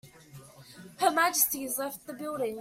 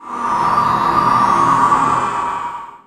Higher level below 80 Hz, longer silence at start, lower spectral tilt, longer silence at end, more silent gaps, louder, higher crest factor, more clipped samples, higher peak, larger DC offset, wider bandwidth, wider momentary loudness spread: second, -70 dBFS vs -46 dBFS; about the same, 0.05 s vs 0 s; second, -1.5 dB/octave vs -5 dB/octave; about the same, 0 s vs 0.1 s; neither; second, -28 LUFS vs -14 LUFS; first, 22 dB vs 14 dB; neither; second, -8 dBFS vs -2 dBFS; neither; first, 16.5 kHz vs 13 kHz; first, 18 LU vs 9 LU